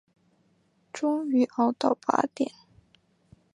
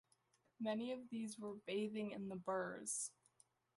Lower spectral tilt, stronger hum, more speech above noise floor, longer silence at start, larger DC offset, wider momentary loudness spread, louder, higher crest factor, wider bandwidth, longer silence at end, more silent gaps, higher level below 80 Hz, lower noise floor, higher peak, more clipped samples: about the same, -5 dB/octave vs -4 dB/octave; neither; first, 42 dB vs 35 dB; first, 0.95 s vs 0.6 s; neither; first, 8 LU vs 5 LU; first, -27 LUFS vs -46 LUFS; first, 24 dB vs 16 dB; second, 10.5 kHz vs 12 kHz; first, 1.05 s vs 0.65 s; neither; first, -72 dBFS vs -86 dBFS; second, -67 dBFS vs -80 dBFS; first, -6 dBFS vs -30 dBFS; neither